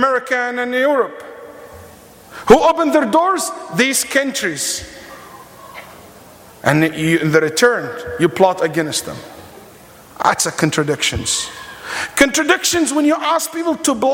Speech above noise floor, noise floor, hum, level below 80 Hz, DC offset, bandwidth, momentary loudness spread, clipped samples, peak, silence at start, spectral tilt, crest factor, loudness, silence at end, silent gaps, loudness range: 26 dB; -42 dBFS; none; -46 dBFS; under 0.1%; 17 kHz; 21 LU; under 0.1%; 0 dBFS; 0 s; -3.5 dB/octave; 18 dB; -16 LUFS; 0 s; none; 4 LU